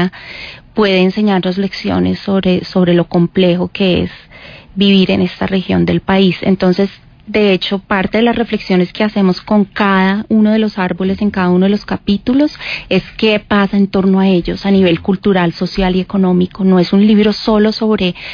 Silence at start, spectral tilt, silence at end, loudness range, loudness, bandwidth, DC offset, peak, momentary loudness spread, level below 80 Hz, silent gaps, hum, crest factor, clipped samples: 0 s; -8 dB/octave; 0 s; 2 LU; -13 LUFS; 5.2 kHz; under 0.1%; -2 dBFS; 6 LU; -38 dBFS; none; none; 10 dB; under 0.1%